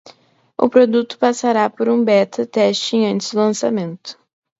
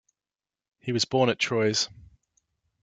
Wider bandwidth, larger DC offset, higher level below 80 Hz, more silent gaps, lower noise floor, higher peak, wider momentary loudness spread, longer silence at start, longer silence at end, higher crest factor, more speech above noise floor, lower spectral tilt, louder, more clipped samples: second, 8 kHz vs 9.6 kHz; neither; about the same, -64 dBFS vs -66 dBFS; neither; second, -50 dBFS vs under -90 dBFS; first, 0 dBFS vs -10 dBFS; first, 11 LU vs 8 LU; second, 0.6 s vs 0.85 s; second, 0.45 s vs 0.9 s; about the same, 16 dB vs 20 dB; second, 34 dB vs over 65 dB; about the same, -5 dB/octave vs -4 dB/octave; first, -16 LUFS vs -25 LUFS; neither